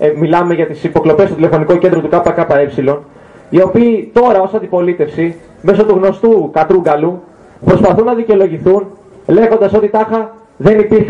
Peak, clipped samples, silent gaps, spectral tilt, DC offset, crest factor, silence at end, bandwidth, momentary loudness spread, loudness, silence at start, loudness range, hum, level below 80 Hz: 0 dBFS; under 0.1%; none; -8.5 dB/octave; under 0.1%; 10 dB; 0 s; 7.4 kHz; 7 LU; -11 LUFS; 0 s; 1 LU; none; -42 dBFS